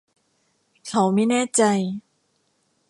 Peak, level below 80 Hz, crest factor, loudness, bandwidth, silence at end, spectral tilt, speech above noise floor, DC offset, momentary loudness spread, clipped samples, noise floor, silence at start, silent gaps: -6 dBFS; -70 dBFS; 18 dB; -21 LUFS; 11.5 kHz; 0.9 s; -4.5 dB/octave; 48 dB; under 0.1%; 15 LU; under 0.1%; -68 dBFS; 0.85 s; none